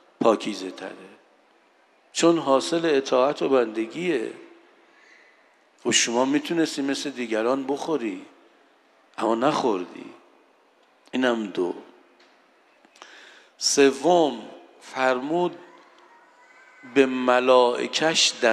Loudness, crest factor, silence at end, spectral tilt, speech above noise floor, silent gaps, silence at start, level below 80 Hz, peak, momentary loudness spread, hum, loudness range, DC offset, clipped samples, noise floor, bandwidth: -23 LUFS; 22 dB; 0 s; -3 dB/octave; 38 dB; none; 0.2 s; -80 dBFS; -4 dBFS; 16 LU; none; 6 LU; under 0.1%; under 0.1%; -60 dBFS; 13 kHz